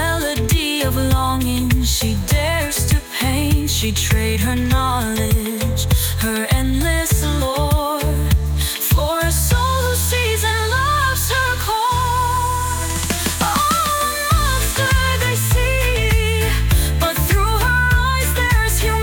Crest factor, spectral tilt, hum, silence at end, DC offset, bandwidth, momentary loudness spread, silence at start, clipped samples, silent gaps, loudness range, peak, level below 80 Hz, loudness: 12 dB; -4 dB/octave; none; 0 s; under 0.1%; 19.5 kHz; 3 LU; 0 s; under 0.1%; none; 1 LU; -4 dBFS; -22 dBFS; -17 LUFS